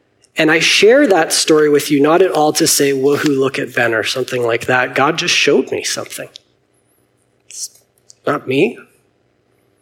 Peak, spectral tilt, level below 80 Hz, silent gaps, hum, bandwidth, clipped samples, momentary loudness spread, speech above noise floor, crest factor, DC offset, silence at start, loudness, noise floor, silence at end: 0 dBFS; -3 dB/octave; -62 dBFS; none; none; 17 kHz; under 0.1%; 16 LU; 46 dB; 14 dB; under 0.1%; 0.35 s; -13 LUFS; -59 dBFS; 1 s